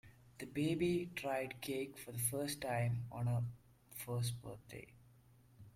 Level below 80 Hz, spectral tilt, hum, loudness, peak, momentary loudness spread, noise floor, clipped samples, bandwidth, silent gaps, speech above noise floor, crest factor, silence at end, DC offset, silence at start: -68 dBFS; -5.5 dB/octave; none; -40 LUFS; -24 dBFS; 16 LU; -66 dBFS; under 0.1%; 16.5 kHz; none; 26 dB; 18 dB; 0.05 s; under 0.1%; 0.05 s